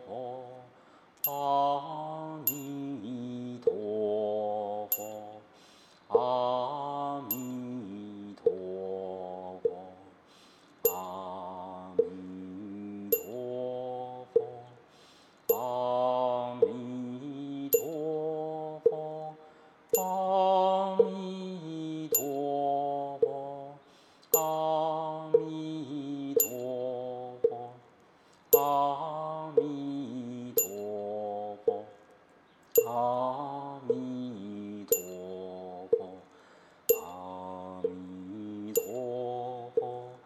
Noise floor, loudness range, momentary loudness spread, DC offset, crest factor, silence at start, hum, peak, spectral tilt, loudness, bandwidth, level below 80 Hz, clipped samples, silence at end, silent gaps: -61 dBFS; 6 LU; 14 LU; under 0.1%; 26 dB; 0 s; none; -8 dBFS; -4.5 dB/octave; -32 LUFS; 14.5 kHz; -78 dBFS; under 0.1%; 0.05 s; none